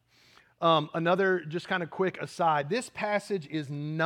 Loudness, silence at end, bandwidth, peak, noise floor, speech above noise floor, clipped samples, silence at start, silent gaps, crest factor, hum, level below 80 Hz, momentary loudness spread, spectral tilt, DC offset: -29 LUFS; 0 s; 12.5 kHz; -10 dBFS; -61 dBFS; 32 dB; under 0.1%; 0.6 s; none; 20 dB; none; -76 dBFS; 8 LU; -5.5 dB/octave; under 0.1%